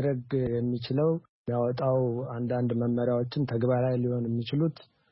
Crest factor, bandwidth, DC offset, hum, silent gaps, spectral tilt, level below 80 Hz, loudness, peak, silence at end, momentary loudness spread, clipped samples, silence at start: 12 dB; 5.8 kHz; under 0.1%; none; 1.29-1.45 s; -12 dB/octave; -60 dBFS; -29 LUFS; -14 dBFS; 0.3 s; 4 LU; under 0.1%; 0 s